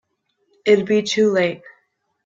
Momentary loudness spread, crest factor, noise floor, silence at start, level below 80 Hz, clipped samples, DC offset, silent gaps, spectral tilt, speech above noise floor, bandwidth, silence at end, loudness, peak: 9 LU; 18 dB; -68 dBFS; 0.65 s; -66 dBFS; under 0.1%; under 0.1%; none; -4.5 dB/octave; 51 dB; 7.6 kHz; 0.55 s; -18 LUFS; -2 dBFS